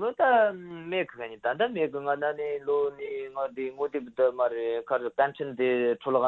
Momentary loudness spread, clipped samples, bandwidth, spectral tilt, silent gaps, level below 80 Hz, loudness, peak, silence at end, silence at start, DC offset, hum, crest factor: 9 LU; under 0.1%; 4.2 kHz; -7.5 dB/octave; none; -70 dBFS; -28 LUFS; -12 dBFS; 0 s; 0 s; under 0.1%; none; 16 dB